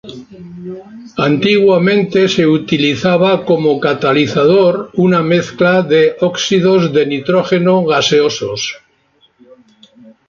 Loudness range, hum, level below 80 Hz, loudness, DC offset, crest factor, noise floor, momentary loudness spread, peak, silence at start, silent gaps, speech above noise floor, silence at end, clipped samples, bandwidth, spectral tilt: 2 LU; none; -52 dBFS; -12 LUFS; under 0.1%; 12 dB; -54 dBFS; 16 LU; 0 dBFS; 0.05 s; none; 43 dB; 1.5 s; under 0.1%; 7.4 kHz; -5.5 dB/octave